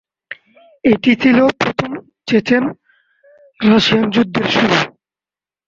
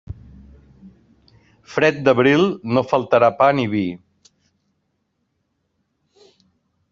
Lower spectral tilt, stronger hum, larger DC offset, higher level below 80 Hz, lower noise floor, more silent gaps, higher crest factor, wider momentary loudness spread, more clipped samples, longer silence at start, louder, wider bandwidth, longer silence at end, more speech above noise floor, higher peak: about the same, -5.5 dB/octave vs -4.5 dB/octave; neither; neither; about the same, -52 dBFS vs -54 dBFS; first, under -90 dBFS vs -71 dBFS; neither; about the same, 16 dB vs 20 dB; about the same, 16 LU vs 16 LU; neither; first, 0.3 s vs 0.1 s; first, -14 LUFS vs -17 LUFS; about the same, 7.6 kHz vs 7.6 kHz; second, 0.8 s vs 2.95 s; first, over 77 dB vs 54 dB; about the same, 0 dBFS vs -2 dBFS